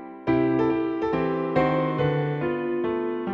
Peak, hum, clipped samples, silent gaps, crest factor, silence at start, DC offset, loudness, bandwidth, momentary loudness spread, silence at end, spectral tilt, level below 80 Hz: -8 dBFS; none; under 0.1%; none; 16 dB; 0 s; under 0.1%; -25 LUFS; 5.8 kHz; 4 LU; 0 s; -9.5 dB/octave; -52 dBFS